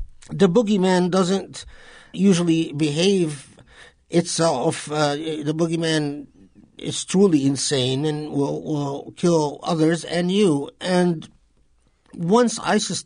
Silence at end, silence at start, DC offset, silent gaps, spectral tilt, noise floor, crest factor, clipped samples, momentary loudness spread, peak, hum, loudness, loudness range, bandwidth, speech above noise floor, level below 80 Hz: 0.05 s; 0 s; under 0.1%; none; -5 dB/octave; -60 dBFS; 16 dB; under 0.1%; 10 LU; -6 dBFS; none; -21 LUFS; 2 LU; 10.5 kHz; 39 dB; -54 dBFS